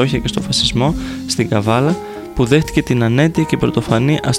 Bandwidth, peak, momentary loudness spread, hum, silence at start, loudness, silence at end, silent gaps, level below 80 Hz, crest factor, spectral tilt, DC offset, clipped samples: 16 kHz; 0 dBFS; 6 LU; none; 0 s; -16 LUFS; 0 s; none; -34 dBFS; 16 dB; -5.5 dB/octave; 0.1%; under 0.1%